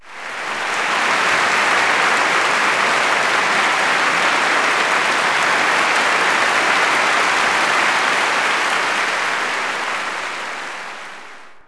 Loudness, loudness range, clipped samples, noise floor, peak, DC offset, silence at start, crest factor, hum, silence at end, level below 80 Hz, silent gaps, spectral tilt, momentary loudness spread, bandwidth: -15 LUFS; 3 LU; under 0.1%; -39 dBFS; -4 dBFS; under 0.1%; 0.05 s; 14 dB; none; 0.05 s; -60 dBFS; none; -1 dB/octave; 10 LU; 11 kHz